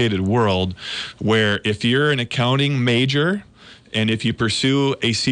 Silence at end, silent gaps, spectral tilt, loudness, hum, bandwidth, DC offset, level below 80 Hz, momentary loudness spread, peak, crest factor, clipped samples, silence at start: 0 s; none; -5 dB/octave; -19 LUFS; none; 10 kHz; under 0.1%; -52 dBFS; 7 LU; -8 dBFS; 12 dB; under 0.1%; 0 s